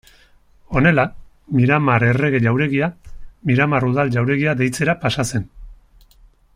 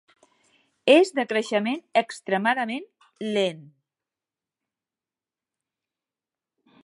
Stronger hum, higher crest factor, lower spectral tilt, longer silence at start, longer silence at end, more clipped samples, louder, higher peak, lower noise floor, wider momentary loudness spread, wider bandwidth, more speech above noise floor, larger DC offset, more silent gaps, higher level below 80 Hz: neither; second, 16 dB vs 24 dB; first, -6.5 dB/octave vs -4.5 dB/octave; second, 0.7 s vs 0.85 s; second, 0.85 s vs 3.25 s; neither; first, -18 LUFS vs -23 LUFS; about the same, -2 dBFS vs -4 dBFS; second, -51 dBFS vs under -90 dBFS; about the same, 9 LU vs 11 LU; first, 15 kHz vs 11.5 kHz; second, 34 dB vs over 67 dB; neither; neither; first, -42 dBFS vs -84 dBFS